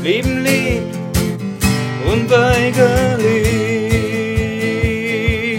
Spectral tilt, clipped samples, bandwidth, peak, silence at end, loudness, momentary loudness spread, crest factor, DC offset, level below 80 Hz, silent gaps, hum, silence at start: -5.5 dB/octave; under 0.1%; 17 kHz; 0 dBFS; 0 s; -16 LUFS; 6 LU; 14 dB; under 0.1%; -30 dBFS; none; none; 0 s